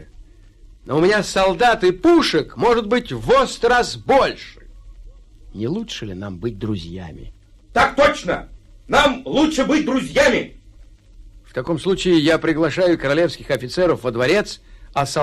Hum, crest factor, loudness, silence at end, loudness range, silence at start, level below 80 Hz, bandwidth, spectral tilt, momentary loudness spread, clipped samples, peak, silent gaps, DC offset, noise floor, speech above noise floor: none; 16 dB; -18 LUFS; 0 s; 6 LU; 0 s; -40 dBFS; 14 kHz; -5 dB/octave; 13 LU; under 0.1%; -4 dBFS; none; under 0.1%; -45 dBFS; 27 dB